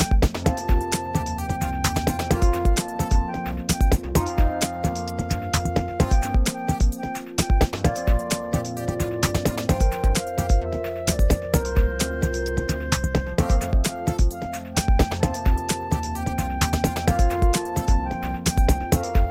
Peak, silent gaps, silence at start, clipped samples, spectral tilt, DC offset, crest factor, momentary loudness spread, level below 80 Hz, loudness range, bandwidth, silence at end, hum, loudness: -6 dBFS; none; 0 s; under 0.1%; -5 dB/octave; 0.1%; 16 dB; 5 LU; -24 dBFS; 1 LU; 16.5 kHz; 0 s; none; -24 LUFS